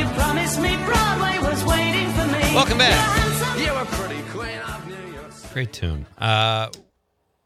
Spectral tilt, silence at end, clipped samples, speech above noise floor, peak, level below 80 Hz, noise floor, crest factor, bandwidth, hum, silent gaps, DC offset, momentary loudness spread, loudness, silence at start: -4 dB/octave; 0.65 s; under 0.1%; 50 dB; -2 dBFS; -34 dBFS; -70 dBFS; 20 dB; 15 kHz; none; none; under 0.1%; 15 LU; -20 LUFS; 0 s